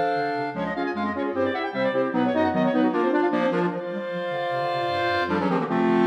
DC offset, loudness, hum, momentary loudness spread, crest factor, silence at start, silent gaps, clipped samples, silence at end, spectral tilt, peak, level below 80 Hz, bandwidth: under 0.1%; -24 LUFS; none; 6 LU; 14 dB; 0 s; none; under 0.1%; 0 s; -7.5 dB/octave; -10 dBFS; -64 dBFS; 9 kHz